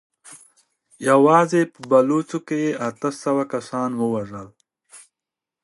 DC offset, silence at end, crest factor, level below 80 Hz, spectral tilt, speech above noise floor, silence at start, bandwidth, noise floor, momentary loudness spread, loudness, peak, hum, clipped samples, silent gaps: under 0.1%; 0.65 s; 20 dB; -68 dBFS; -6 dB/octave; 67 dB; 0.3 s; 11.5 kHz; -87 dBFS; 12 LU; -20 LUFS; -2 dBFS; none; under 0.1%; none